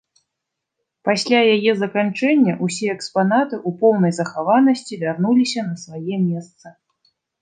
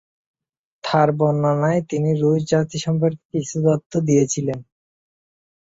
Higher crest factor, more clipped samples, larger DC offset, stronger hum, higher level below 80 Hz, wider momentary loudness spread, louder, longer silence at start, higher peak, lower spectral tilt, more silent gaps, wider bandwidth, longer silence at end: about the same, 16 dB vs 18 dB; neither; neither; neither; second, -72 dBFS vs -58 dBFS; about the same, 10 LU vs 8 LU; about the same, -18 LUFS vs -20 LUFS; first, 1.05 s vs 0.85 s; about the same, -2 dBFS vs -4 dBFS; about the same, -5.5 dB/octave vs -6.5 dB/octave; second, none vs 3.25-3.30 s, 3.86-3.90 s; first, 9.6 kHz vs 8 kHz; second, 0.7 s vs 1.15 s